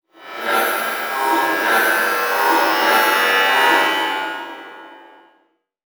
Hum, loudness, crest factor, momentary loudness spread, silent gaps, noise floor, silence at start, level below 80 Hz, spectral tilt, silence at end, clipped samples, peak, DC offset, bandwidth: none; -16 LUFS; 16 dB; 14 LU; none; -62 dBFS; 0.2 s; -86 dBFS; -0.5 dB/octave; 1 s; under 0.1%; -2 dBFS; under 0.1%; over 20 kHz